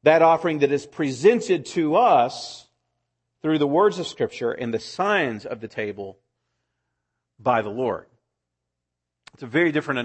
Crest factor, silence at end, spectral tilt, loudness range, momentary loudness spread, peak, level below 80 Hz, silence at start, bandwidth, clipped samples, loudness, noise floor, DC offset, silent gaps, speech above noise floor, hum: 18 dB; 0 s; -5.5 dB/octave; 8 LU; 15 LU; -4 dBFS; -68 dBFS; 0.05 s; 8.8 kHz; under 0.1%; -22 LUFS; -83 dBFS; under 0.1%; none; 61 dB; 60 Hz at -60 dBFS